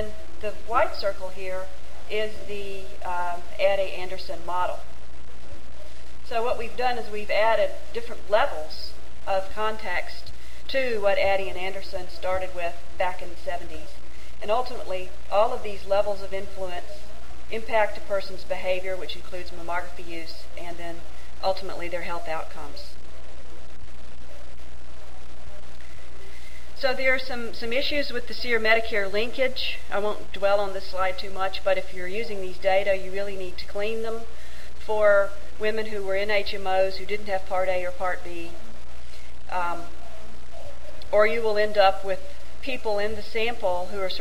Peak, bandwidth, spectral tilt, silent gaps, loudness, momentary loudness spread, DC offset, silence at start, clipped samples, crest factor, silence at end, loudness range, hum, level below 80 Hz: -4 dBFS; 16 kHz; -4.5 dB/octave; none; -27 LUFS; 23 LU; 9%; 0 s; under 0.1%; 22 dB; 0 s; 8 LU; none; -46 dBFS